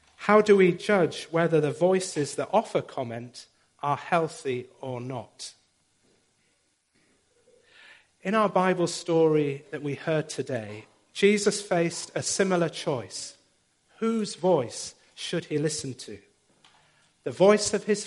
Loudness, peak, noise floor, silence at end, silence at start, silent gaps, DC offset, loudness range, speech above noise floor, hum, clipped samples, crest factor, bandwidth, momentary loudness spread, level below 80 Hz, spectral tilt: -26 LUFS; -6 dBFS; -70 dBFS; 0 s; 0.2 s; none; under 0.1%; 7 LU; 45 dB; none; under 0.1%; 22 dB; 11.5 kHz; 17 LU; -70 dBFS; -4.5 dB/octave